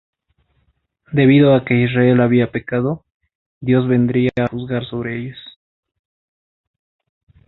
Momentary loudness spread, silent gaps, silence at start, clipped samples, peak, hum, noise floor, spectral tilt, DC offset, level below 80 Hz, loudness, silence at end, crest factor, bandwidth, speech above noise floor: 15 LU; 3.14-3.20 s, 3.35-3.61 s; 1.1 s; under 0.1%; -2 dBFS; none; -64 dBFS; -10.5 dB/octave; under 0.1%; -52 dBFS; -16 LUFS; 2 s; 16 dB; 4.1 kHz; 49 dB